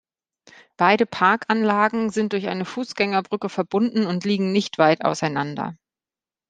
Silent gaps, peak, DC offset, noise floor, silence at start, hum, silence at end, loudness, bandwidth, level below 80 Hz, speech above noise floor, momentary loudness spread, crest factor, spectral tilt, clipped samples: none; -2 dBFS; under 0.1%; under -90 dBFS; 0.8 s; none; 0.75 s; -21 LUFS; 9.4 kHz; -66 dBFS; over 69 dB; 9 LU; 20 dB; -5.5 dB/octave; under 0.1%